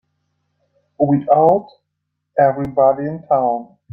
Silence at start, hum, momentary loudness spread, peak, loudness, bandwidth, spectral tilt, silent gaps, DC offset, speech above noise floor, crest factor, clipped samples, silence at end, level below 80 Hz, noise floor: 1 s; none; 9 LU; -2 dBFS; -16 LUFS; 4.4 kHz; -11 dB/octave; none; under 0.1%; 60 dB; 16 dB; under 0.1%; 0.3 s; -56 dBFS; -75 dBFS